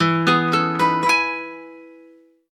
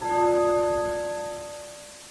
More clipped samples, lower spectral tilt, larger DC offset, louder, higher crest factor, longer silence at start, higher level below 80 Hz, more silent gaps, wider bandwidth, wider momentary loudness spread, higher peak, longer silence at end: neither; about the same, -5 dB/octave vs -4.5 dB/octave; neither; first, -18 LUFS vs -25 LUFS; about the same, 16 dB vs 14 dB; about the same, 0 s vs 0 s; second, -68 dBFS vs -54 dBFS; neither; first, 14 kHz vs 11 kHz; second, 15 LU vs 18 LU; first, -4 dBFS vs -12 dBFS; first, 0.6 s vs 0 s